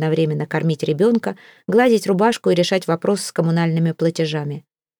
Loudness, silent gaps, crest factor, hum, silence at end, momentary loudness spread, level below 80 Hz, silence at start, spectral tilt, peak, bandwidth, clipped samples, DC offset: -19 LUFS; none; 16 dB; none; 0.4 s; 8 LU; -68 dBFS; 0 s; -6 dB/octave; -4 dBFS; 19 kHz; under 0.1%; under 0.1%